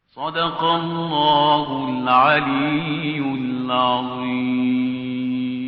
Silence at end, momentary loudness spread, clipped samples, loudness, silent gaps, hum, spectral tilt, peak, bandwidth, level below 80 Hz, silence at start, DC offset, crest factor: 0 s; 8 LU; under 0.1%; -20 LUFS; none; none; -3 dB/octave; -4 dBFS; 5.2 kHz; -58 dBFS; 0.15 s; under 0.1%; 16 dB